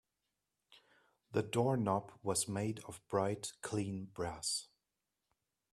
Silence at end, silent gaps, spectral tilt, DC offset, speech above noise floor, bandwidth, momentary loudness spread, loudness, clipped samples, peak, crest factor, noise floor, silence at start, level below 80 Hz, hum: 1.05 s; none; -4.5 dB/octave; under 0.1%; 51 dB; 14.5 kHz; 8 LU; -38 LUFS; under 0.1%; -20 dBFS; 20 dB; -89 dBFS; 0.75 s; -70 dBFS; none